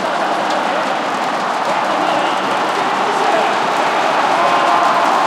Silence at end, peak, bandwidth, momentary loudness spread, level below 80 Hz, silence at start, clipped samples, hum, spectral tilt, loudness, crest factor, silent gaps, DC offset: 0 s; -2 dBFS; 16 kHz; 5 LU; -70 dBFS; 0 s; under 0.1%; none; -3 dB/octave; -15 LUFS; 14 dB; none; under 0.1%